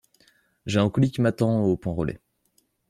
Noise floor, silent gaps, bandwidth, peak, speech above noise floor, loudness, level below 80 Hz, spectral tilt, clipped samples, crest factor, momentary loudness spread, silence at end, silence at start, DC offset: -68 dBFS; none; 13.5 kHz; -8 dBFS; 46 dB; -24 LUFS; -52 dBFS; -7.5 dB/octave; under 0.1%; 18 dB; 11 LU; 0.75 s; 0.65 s; under 0.1%